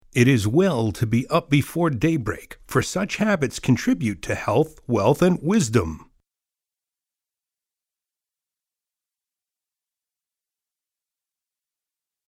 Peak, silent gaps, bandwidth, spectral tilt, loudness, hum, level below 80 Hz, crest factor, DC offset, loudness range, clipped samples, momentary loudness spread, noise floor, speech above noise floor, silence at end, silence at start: -4 dBFS; none; 16 kHz; -6 dB/octave; -21 LUFS; none; -48 dBFS; 20 dB; under 0.1%; 5 LU; under 0.1%; 7 LU; -89 dBFS; 69 dB; 6.25 s; 0.15 s